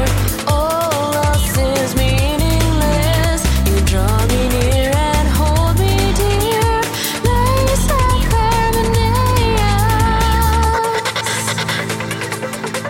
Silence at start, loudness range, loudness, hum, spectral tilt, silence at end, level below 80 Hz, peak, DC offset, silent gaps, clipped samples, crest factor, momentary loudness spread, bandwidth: 0 s; 1 LU; -15 LUFS; none; -4.5 dB/octave; 0 s; -20 dBFS; -4 dBFS; under 0.1%; none; under 0.1%; 10 dB; 3 LU; 17 kHz